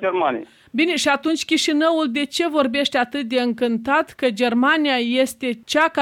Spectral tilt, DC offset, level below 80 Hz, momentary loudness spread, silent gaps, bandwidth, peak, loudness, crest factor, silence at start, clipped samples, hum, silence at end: -3 dB/octave; under 0.1%; -62 dBFS; 5 LU; none; 16.5 kHz; -4 dBFS; -20 LUFS; 14 dB; 0 s; under 0.1%; none; 0 s